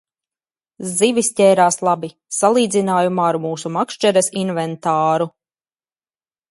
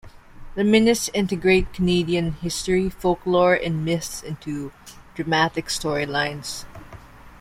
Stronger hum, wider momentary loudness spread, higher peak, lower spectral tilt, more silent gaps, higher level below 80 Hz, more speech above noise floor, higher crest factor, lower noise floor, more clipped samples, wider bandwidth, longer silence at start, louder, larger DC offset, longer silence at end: neither; second, 9 LU vs 14 LU; first, 0 dBFS vs -4 dBFS; about the same, -4 dB/octave vs -5 dB/octave; neither; second, -68 dBFS vs -42 dBFS; first, over 73 dB vs 21 dB; about the same, 18 dB vs 18 dB; first, under -90 dBFS vs -43 dBFS; neither; second, 12 kHz vs 16 kHz; first, 0.8 s vs 0.05 s; first, -17 LUFS vs -22 LUFS; neither; first, 1.2 s vs 0.05 s